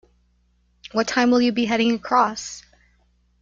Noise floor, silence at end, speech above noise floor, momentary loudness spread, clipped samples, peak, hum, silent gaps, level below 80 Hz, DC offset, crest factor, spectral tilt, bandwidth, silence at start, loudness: -63 dBFS; 0.8 s; 43 dB; 15 LU; under 0.1%; -4 dBFS; 60 Hz at -40 dBFS; none; -58 dBFS; under 0.1%; 18 dB; -3.5 dB/octave; 7.6 kHz; 0.85 s; -20 LUFS